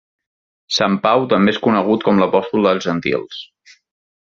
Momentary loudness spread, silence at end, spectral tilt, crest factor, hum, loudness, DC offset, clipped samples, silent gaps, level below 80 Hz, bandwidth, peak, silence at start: 7 LU; 0.9 s; -5.5 dB/octave; 16 dB; none; -16 LUFS; under 0.1%; under 0.1%; none; -56 dBFS; 7.6 kHz; -2 dBFS; 0.7 s